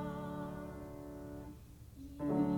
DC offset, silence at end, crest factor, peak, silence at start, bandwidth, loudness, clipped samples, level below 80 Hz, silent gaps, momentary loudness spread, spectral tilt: under 0.1%; 0 s; 18 dB; -24 dBFS; 0 s; 20 kHz; -44 LUFS; under 0.1%; -58 dBFS; none; 16 LU; -8.5 dB/octave